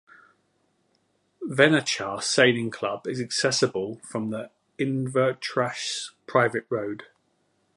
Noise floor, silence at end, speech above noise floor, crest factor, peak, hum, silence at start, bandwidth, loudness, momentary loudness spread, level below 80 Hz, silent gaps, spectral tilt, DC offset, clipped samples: -70 dBFS; 0.75 s; 45 dB; 24 dB; -2 dBFS; none; 1.4 s; 11.5 kHz; -25 LUFS; 13 LU; -70 dBFS; none; -4 dB/octave; under 0.1%; under 0.1%